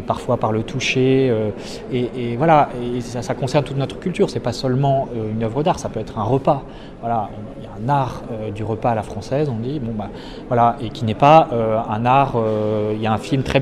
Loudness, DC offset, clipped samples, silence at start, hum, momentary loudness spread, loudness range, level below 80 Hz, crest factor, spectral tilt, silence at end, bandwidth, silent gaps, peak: -19 LUFS; under 0.1%; under 0.1%; 0 s; none; 11 LU; 6 LU; -42 dBFS; 18 dB; -6.5 dB/octave; 0 s; 12 kHz; none; 0 dBFS